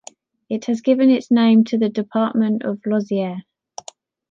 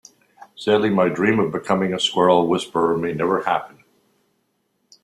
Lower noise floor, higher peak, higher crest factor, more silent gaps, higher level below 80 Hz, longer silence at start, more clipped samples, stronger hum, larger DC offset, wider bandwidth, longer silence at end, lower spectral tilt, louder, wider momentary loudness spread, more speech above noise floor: second, -44 dBFS vs -69 dBFS; about the same, -4 dBFS vs -2 dBFS; about the same, 14 dB vs 18 dB; neither; second, -70 dBFS vs -60 dBFS; about the same, 0.5 s vs 0.4 s; neither; neither; neither; second, 7.4 kHz vs 13 kHz; second, 0.9 s vs 1.35 s; about the same, -6.5 dB/octave vs -5.5 dB/octave; about the same, -18 LUFS vs -19 LUFS; first, 21 LU vs 5 LU; second, 27 dB vs 50 dB